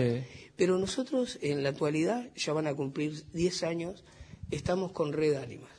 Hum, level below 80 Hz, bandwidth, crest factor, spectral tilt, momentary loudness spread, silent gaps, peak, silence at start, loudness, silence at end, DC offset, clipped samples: none; -58 dBFS; 10.5 kHz; 18 dB; -5.5 dB/octave; 8 LU; none; -14 dBFS; 0 s; -32 LUFS; 0.05 s; under 0.1%; under 0.1%